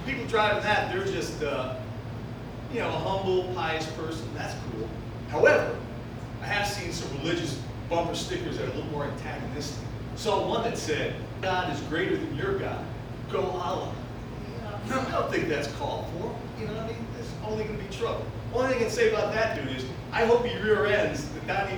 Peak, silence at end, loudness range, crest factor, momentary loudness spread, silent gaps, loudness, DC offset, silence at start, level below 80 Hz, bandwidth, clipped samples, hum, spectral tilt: -6 dBFS; 0 s; 5 LU; 22 dB; 12 LU; none; -29 LUFS; under 0.1%; 0 s; -46 dBFS; over 20 kHz; under 0.1%; none; -5 dB/octave